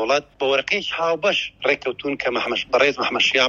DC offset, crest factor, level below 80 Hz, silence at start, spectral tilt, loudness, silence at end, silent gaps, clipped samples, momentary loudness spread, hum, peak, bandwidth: under 0.1%; 18 dB; -58 dBFS; 0 s; -2.5 dB/octave; -20 LUFS; 0 s; none; under 0.1%; 5 LU; none; -4 dBFS; 7.6 kHz